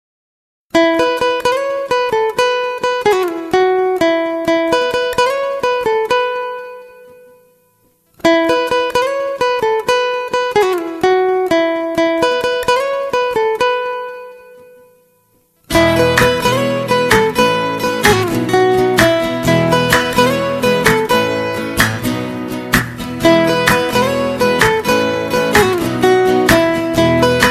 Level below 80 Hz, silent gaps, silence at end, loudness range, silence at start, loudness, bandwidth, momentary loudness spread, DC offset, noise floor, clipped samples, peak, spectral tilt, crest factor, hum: -40 dBFS; none; 0 s; 5 LU; 0.75 s; -14 LUFS; 16 kHz; 6 LU; under 0.1%; -56 dBFS; under 0.1%; 0 dBFS; -4.5 dB/octave; 14 dB; none